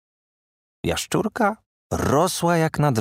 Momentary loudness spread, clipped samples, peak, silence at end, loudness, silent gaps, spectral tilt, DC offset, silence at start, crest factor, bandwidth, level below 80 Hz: 10 LU; under 0.1%; -4 dBFS; 0 s; -22 LUFS; 1.66-1.90 s; -5 dB/octave; under 0.1%; 0.85 s; 18 dB; 16 kHz; -46 dBFS